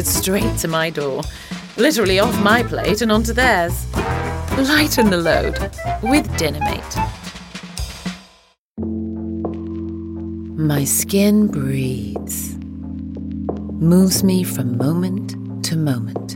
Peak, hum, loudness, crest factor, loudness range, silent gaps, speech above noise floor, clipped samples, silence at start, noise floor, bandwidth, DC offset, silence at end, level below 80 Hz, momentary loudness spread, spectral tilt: -2 dBFS; none; -19 LUFS; 18 dB; 9 LU; 8.58-8.75 s; 36 dB; under 0.1%; 0 s; -53 dBFS; 17 kHz; under 0.1%; 0 s; -34 dBFS; 14 LU; -4.5 dB/octave